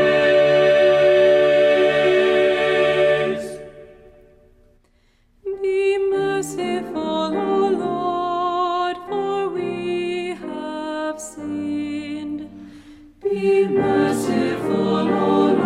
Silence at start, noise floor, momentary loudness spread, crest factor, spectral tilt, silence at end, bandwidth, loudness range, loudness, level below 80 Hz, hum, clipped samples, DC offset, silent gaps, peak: 0 s; -59 dBFS; 14 LU; 14 dB; -5.5 dB/octave; 0 s; 13 kHz; 10 LU; -19 LUFS; -54 dBFS; none; under 0.1%; under 0.1%; none; -4 dBFS